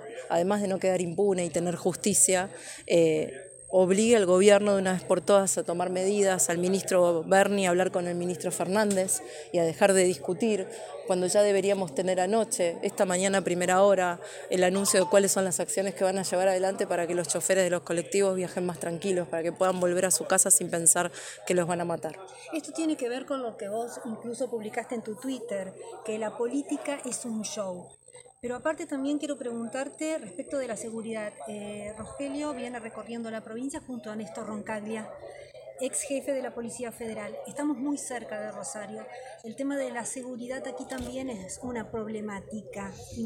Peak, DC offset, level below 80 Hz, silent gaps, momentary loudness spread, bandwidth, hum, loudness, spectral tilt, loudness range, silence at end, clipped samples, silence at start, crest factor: -6 dBFS; under 0.1%; -66 dBFS; none; 15 LU; 17 kHz; none; -27 LUFS; -3.5 dB/octave; 12 LU; 0 s; under 0.1%; 0 s; 22 dB